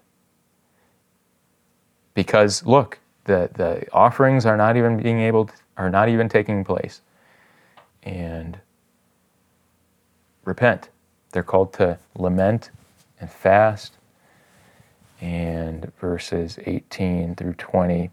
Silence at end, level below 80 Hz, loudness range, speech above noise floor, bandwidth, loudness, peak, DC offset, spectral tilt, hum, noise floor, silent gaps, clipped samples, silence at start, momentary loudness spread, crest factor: 0.05 s; -54 dBFS; 11 LU; 45 dB; 13 kHz; -21 LUFS; 0 dBFS; under 0.1%; -6.5 dB/octave; none; -65 dBFS; none; under 0.1%; 2.15 s; 15 LU; 22 dB